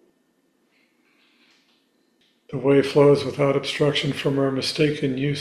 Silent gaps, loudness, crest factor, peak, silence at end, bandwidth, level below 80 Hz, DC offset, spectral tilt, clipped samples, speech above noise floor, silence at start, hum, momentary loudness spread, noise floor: none; -21 LUFS; 18 dB; -4 dBFS; 0 s; 13.5 kHz; -58 dBFS; under 0.1%; -6 dB/octave; under 0.1%; 46 dB; 2.5 s; none; 7 LU; -66 dBFS